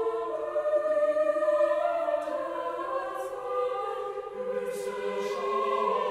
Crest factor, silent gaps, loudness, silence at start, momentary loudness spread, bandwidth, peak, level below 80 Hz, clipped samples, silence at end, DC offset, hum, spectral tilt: 14 dB; none; -29 LUFS; 0 s; 8 LU; 14 kHz; -14 dBFS; -70 dBFS; under 0.1%; 0 s; under 0.1%; none; -4 dB/octave